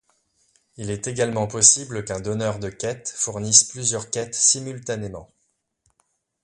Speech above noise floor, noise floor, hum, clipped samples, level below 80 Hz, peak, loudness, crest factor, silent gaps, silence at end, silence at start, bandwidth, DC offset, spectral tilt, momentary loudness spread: 49 dB; -72 dBFS; none; under 0.1%; -54 dBFS; 0 dBFS; -20 LUFS; 24 dB; none; 1.2 s; 0.8 s; 11.5 kHz; under 0.1%; -2 dB/octave; 16 LU